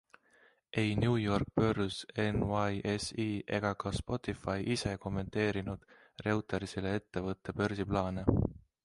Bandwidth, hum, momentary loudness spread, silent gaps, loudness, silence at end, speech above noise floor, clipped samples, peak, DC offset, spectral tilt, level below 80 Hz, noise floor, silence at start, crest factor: 11.5 kHz; none; 7 LU; none; -34 LUFS; 0.25 s; 33 dB; under 0.1%; -12 dBFS; under 0.1%; -6 dB/octave; -50 dBFS; -67 dBFS; 0.75 s; 22 dB